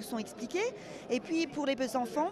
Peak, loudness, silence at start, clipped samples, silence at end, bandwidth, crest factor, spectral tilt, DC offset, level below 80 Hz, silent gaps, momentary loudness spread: -20 dBFS; -34 LUFS; 0 s; under 0.1%; 0 s; 14.5 kHz; 14 dB; -4 dB/octave; under 0.1%; -70 dBFS; none; 6 LU